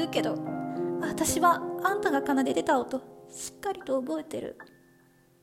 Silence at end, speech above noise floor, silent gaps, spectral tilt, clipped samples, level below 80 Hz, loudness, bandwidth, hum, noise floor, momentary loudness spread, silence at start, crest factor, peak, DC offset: 0.75 s; 33 dB; none; -4 dB/octave; under 0.1%; -62 dBFS; -29 LUFS; 16 kHz; none; -61 dBFS; 14 LU; 0 s; 18 dB; -10 dBFS; under 0.1%